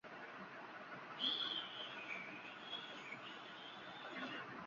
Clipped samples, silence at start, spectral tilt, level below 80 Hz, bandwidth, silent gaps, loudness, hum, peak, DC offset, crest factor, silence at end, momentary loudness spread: under 0.1%; 0.05 s; 0.5 dB/octave; under -90 dBFS; 7.2 kHz; none; -46 LUFS; none; -28 dBFS; under 0.1%; 22 dB; 0 s; 12 LU